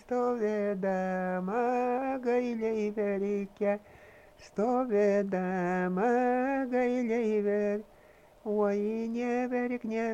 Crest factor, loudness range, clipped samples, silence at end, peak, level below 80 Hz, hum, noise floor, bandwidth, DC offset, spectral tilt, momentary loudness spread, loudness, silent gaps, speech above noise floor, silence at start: 14 dB; 3 LU; under 0.1%; 0 s; -16 dBFS; -66 dBFS; none; -58 dBFS; 8.8 kHz; under 0.1%; -8 dB/octave; 5 LU; -30 LUFS; none; 28 dB; 0.1 s